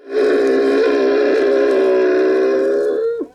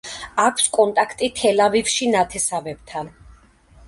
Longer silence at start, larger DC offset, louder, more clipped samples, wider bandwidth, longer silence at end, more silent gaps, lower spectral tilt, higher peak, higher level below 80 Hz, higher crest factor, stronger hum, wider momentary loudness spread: about the same, 0.05 s vs 0.05 s; neither; first, -15 LUFS vs -19 LUFS; neither; second, 9.4 kHz vs 11.5 kHz; second, 0.1 s vs 0.6 s; neither; first, -4.5 dB/octave vs -2 dB/octave; about the same, -6 dBFS vs -4 dBFS; second, -60 dBFS vs -52 dBFS; second, 8 dB vs 18 dB; neither; second, 3 LU vs 14 LU